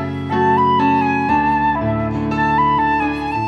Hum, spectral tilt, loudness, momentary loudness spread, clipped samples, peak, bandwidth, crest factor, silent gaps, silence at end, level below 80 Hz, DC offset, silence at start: none; -7.5 dB/octave; -16 LUFS; 6 LU; under 0.1%; -4 dBFS; 8 kHz; 12 dB; none; 0 s; -38 dBFS; under 0.1%; 0 s